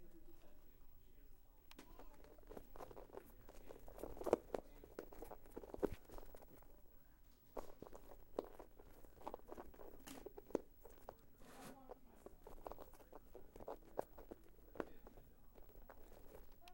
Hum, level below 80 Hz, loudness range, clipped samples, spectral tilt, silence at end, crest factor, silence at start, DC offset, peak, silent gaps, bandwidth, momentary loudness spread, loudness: none; -64 dBFS; 11 LU; under 0.1%; -6 dB/octave; 0 s; 36 dB; 0 s; under 0.1%; -18 dBFS; none; 16 kHz; 18 LU; -54 LUFS